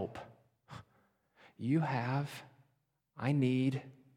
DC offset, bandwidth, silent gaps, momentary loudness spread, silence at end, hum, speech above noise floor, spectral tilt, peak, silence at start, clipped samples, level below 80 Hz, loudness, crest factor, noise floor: under 0.1%; 13.5 kHz; none; 22 LU; 0.25 s; none; 46 dB; -8 dB/octave; -20 dBFS; 0 s; under 0.1%; -76 dBFS; -35 LUFS; 18 dB; -79 dBFS